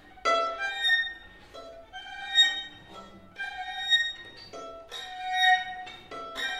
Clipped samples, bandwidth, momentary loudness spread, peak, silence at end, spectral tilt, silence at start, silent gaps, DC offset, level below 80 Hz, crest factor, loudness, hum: under 0.1%; 16 kHz; 23 LU; -10 dBFS; 0 s; 0 dB/octave; 0.05 s; none; under 0.1%; -62 dBFS; 20 dB; -26 LUFS; none